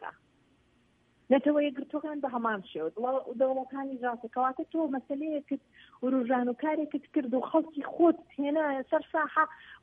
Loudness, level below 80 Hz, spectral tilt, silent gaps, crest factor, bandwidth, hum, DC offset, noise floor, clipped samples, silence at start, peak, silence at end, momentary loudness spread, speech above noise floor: -31 LUFS; -76 dBFS; -8 dB/octave; none; 20 dB; 3.8 kHz; none; under 0.1%; -68 dBFS; under 0.1%; 0 s; -10 dBFS; 0.05 s; 10 LU; 37 dB